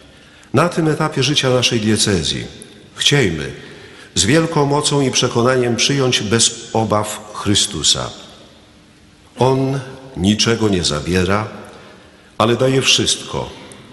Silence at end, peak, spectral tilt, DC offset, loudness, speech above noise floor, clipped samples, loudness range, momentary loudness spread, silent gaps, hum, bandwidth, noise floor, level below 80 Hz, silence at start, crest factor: 0.1 s; 0 dBFS; -3.5 dB/octave; under 0.1%; -16 LUFS; 30 dB; under 0.1%; 3 LU; 13 LU; none; none; 12 kHz; -46 dBFS; -42 dBFS; 0.55 s; 18 dB